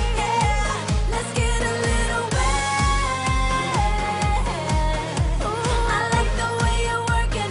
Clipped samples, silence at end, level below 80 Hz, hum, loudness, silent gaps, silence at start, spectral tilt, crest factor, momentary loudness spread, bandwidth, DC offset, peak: under 0.1%; 0 s; -24 dBFS; none; -22 LUFS; none; 0 s; -4 dB/octave; 12 dB; 3 LU; 11 kHz; under 0.1%; -8 dBFS